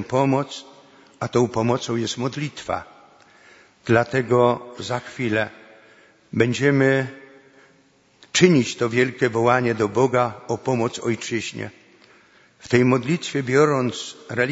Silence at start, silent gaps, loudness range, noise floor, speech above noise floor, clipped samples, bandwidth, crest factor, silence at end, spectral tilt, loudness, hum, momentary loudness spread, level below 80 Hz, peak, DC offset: 0 s; none; 4 LU; -58 dBFS; 37 dB; under 0.1%; 8 kHz; 22 dB; 0 s; -5.5 dB/octave; -21 LUFS; none; 12 LU; -60 dBFS; 0 dBFS; under 0.1%